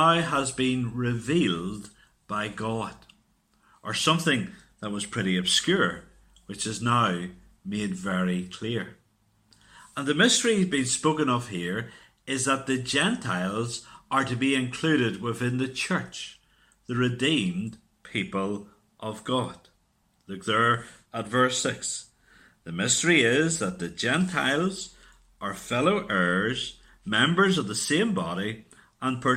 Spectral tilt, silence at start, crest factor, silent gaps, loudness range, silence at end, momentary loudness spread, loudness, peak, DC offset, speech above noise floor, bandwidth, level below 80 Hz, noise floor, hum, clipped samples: -4 dB/octave; 0 s; 20 dB; none; 5 LU; 0 s; 15 LU; -26 LUFS; -6 dBFS; under 0.1%; 42 dB; 15.5 kHz; -60 dBFS; -68 dBFS; none; under 0.1%